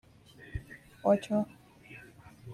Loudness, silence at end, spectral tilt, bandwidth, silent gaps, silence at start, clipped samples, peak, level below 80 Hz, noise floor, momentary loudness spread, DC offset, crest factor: -32 LUFS; 0 s; -7.5 dB/octave; 13.5 kHz; none; 0.4 s; under 0.1%; -14 dBFS; -54 dBFS; -55 dBFS; 24 LU; under 0.1%; 20 dB